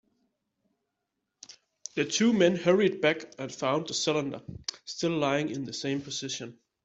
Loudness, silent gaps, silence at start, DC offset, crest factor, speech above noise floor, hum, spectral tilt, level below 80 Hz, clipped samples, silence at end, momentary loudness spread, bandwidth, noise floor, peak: -28 LUFS; none; 1.5 s; under 0.1%; 20 dB; 55 dB; none; -4 dB/octave; -68 dBFS; under 0.1%; 0.3 s; 14 LU; 8.2 kHz; -83 dBFS; -10 dBFS